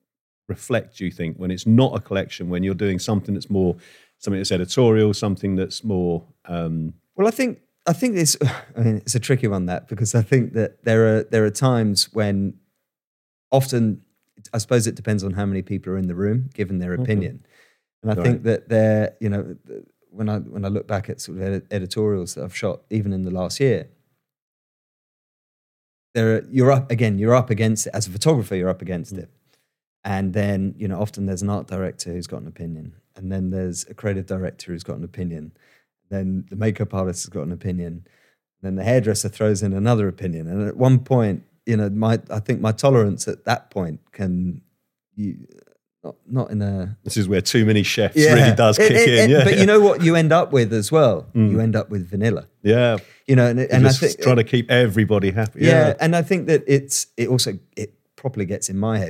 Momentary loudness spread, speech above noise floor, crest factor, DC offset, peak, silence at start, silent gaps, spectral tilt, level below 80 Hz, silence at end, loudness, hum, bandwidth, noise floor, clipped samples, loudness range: 14 LU; 51 dB; 20 dB; under 0.1%; 0 dBFS; 0.5 s; 13.07-13.51 s, 17.93-18.02 s, 24.42-26.14 s, 29.87-30.03 s; -5.5 dB/octave; -60 dBFS; 0 s; -20 LUFS; none; 16 kHz; -70 dBFS; under 0.1%; 12 LU